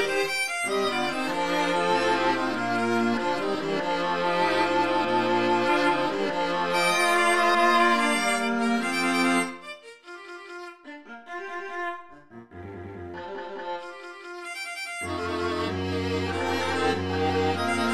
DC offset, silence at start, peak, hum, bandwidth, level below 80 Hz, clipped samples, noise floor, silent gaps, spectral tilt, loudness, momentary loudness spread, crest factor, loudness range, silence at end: 0.5%; 0 s; -10 dBFS; none; 14.5 kHz; -58 dBFS; under 0.1%; -47 dBFS; none; -4 dB/octave; -25 LUFS; 19 LU; 16 dB; 14 LU; 0 s